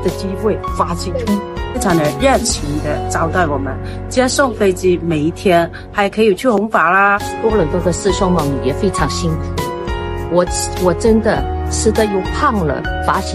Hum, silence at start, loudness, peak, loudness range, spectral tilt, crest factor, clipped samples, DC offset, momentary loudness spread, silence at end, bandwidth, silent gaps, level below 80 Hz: none; 0 s; -16 LUFS; 0 dBFS; 3 LU; -5 dB/octave; 14 dB; under 0.1%; under 0.1%; 7 LU; 0 s; 15.5 kHz; none; -28 dBFS